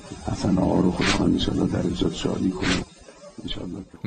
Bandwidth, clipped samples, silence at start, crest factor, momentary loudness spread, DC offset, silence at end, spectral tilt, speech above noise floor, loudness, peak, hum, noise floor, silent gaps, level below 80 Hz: 9.4 kHz; under 0.1%; 0 s; 16 dB; 14 LU; under 0.1%; 0 s; -5.5 dB/octave; 23 dB; -24 LUFS; -8 dBFS; none; -46 dBFS; none; -38 dBFS